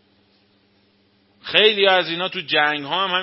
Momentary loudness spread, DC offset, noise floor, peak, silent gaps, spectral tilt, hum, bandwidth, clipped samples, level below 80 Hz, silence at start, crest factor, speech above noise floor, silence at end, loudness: 10 LU; under 0.1%; -60 dBFS; 0 dBFS; none; -6 dB/octave; none; 5.8 kHz; under 0.1%; -72 dBFS; 1.45 s; 22 dB; 41 dB; 0 s; -17 LUFS